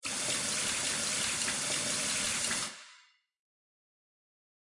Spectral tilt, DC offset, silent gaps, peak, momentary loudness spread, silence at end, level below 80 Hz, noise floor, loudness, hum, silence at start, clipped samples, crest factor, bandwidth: 0 dB/octave; under 0.1%; none; -18 dBFS; 3 LU; 1.7 s; -66 dBFS; -63 dBFS; -30 LUFS; none; 0.05 s; under 0.1%; 18 dB; 11.5 kHz